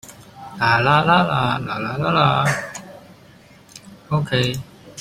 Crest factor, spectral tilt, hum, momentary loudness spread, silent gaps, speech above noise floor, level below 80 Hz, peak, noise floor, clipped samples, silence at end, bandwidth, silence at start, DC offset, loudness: 18 dB; -5.5 dB/octave; none; 20 LU; none; 29 dB; -50 dBFS; -2 dBFS; -47 dBFS; under 0.1%; 0 s; 15.5 kHz; 0.05 s; under 0.1%; -18 LUFS